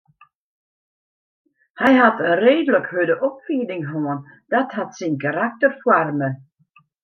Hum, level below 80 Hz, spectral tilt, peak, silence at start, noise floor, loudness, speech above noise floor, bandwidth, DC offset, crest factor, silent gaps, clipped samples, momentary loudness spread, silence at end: none; -68 dBFS; -6.5 dB/octave; -2 dBFS; 1.75 s; -58 dBFS; -19 LUFS; 39 dB; 6.8 kHz; under 0.1%; 18 dB; none; under 0.1%; 11 LU; 0.65 s